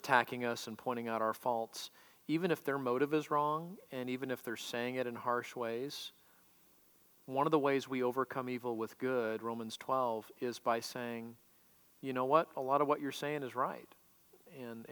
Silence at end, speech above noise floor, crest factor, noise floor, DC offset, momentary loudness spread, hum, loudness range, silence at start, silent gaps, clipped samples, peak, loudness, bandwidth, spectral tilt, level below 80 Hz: 0 s; 30 dB; 26 dB; -66 dBFS; under 0.1%; 14 LU; none; 3 LU; 0.05 s; none; under 0.1%; -12 dBFS; -37 LUFS; over 20 kHz; -5 dB/octave; -88 dBFS